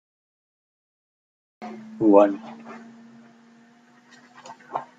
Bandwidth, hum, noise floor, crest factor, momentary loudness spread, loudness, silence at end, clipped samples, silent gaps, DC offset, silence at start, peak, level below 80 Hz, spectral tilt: 7.6 kHz; none; -55 dBFS; 24 dB; 27 LU; -20 LUFS; 0.15 s; under 0.1%; none; under 0.1%; 1.6 s; -2 dBFS; -74 dBFS; -7.5 dB/octave